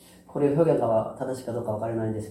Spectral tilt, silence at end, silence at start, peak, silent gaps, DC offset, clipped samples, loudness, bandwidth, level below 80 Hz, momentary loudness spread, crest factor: -8.5 dB/octave; 0 s; 0.3 s; -8 dBFS; none; under 0.1%; under 0.1%; -26 LUFS; 14 kHz; -60 dBFS; 10 LU; 18 dB